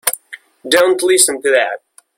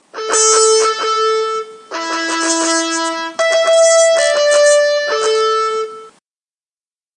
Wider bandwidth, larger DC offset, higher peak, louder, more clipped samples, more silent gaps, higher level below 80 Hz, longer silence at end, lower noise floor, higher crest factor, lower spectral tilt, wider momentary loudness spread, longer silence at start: first, 17 kHz vs 11 kHz; neither; about the same, 0 dBFS vs 0 dBFS; about the same, -13 LUFS vs -13 LUFS; neither; neither; first, -62 dBFS vs -80 dBFS; second, 0.4 s vs 1.05 s; second, -38 dBFS vs under -90 dBFS; about the same, 16 dB vs 14 dB; first, 0 dB/octave vs 1.5 dB/octave; first, 17 LU vs 11 LU; about the same, 0.05 s vs 0.15 s